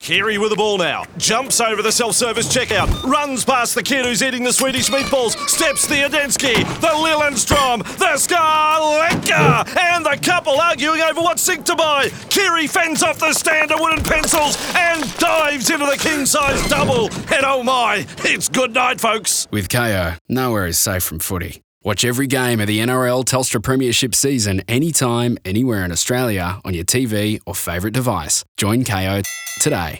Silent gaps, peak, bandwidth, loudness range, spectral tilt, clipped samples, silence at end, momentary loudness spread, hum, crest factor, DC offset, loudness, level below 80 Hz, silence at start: 20.21-20.25 s, 21.64-21.81 s, 28.48-28.55 s; -2 dBFS; over 20 kHz; 4 LU; -3 dB/octave; under 0.1%; 0 s; 5 LU; none; 16 dB; under 0.1%; -16 LUFS; -40 dBFS; 0 s